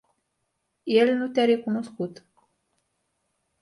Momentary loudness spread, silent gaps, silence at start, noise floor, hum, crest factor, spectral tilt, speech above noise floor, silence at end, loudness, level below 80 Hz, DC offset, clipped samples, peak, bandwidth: 14 LU; none; 0.85 s; -77 dBFS; none; 20 dB; -6 dB/octave; 54 dB; 1.5 s; -24 LUFS; -74 dBFS; under 0.1%; under 0.1%; -8 dBFS; 11.5 kHz